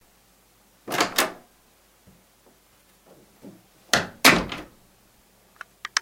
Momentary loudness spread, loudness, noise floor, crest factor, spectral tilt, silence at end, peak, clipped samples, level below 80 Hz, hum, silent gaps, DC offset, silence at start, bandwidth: 28 LU; -21 LUFS; -59 dBFS; 28 dB; -2 dB/octave; 0 s; 0 dBFS; under 0.1%; -54 dBFS; none; none; under 0.1%; 0.85 s; 17 kHz